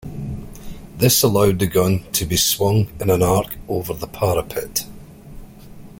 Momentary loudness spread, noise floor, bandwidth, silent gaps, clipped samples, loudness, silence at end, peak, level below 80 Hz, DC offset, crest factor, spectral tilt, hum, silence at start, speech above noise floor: 16 LU; -39 dBFS; 17 kHz; none; under 0.1%; -18 LUFS; 0.05 s; -2 dBFS; -40 dBFS; under 0.1%; 18 dB; -4.5 dB/octave; none; 0.05 s; 21 dB